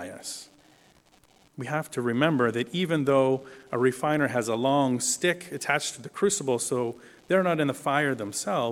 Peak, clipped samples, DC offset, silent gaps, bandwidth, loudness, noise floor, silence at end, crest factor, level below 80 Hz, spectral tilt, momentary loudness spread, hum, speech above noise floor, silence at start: -6 dBFS; under 0.1%; under 0.1%; none; 17 kHz; -26 LUFS; -60 dBFS; 0 s; 20 dB; -70 dBFS; -4.5 dB/octave; 10 LU; none; 34 dB; 0 s